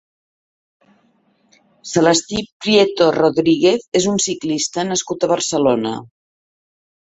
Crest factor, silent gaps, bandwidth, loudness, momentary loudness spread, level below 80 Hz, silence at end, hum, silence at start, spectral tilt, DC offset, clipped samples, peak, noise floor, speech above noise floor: 16 dB; 2.52-2.60 s, 3.88-3.92 s; 8.4 kHz; -16 LUFS; 8 LU; -56 dBFS; 0.95 s; none; 1.85 s; -3.5 dB/octave; under 0.1%; under 0.1%; -2 dBFS; -59 dBFS; 43 dB